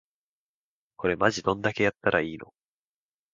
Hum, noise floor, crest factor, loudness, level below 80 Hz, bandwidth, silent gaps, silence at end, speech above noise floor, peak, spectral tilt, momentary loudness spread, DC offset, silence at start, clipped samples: none; under -90 dBFS; 24 dB; -26 LUFS; -58 dBFS; 7.6 kHz; none; 0.9 s; over 64 dB; -6 dBFS; -5 dB/octave; 8 LU; under 0.1%; 1 s; under 0.1%